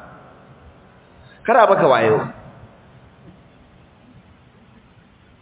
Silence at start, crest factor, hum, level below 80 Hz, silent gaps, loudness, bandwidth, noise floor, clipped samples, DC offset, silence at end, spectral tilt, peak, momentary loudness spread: 1.45 s; 22 dB; none; -56 dBFS; none; -16 LUFS; 4 kHz; -50 dBFS; under 0.1%; under 0.1%; 3.1 s; -9.5 dB/octave; 0 dBFS; 18 LU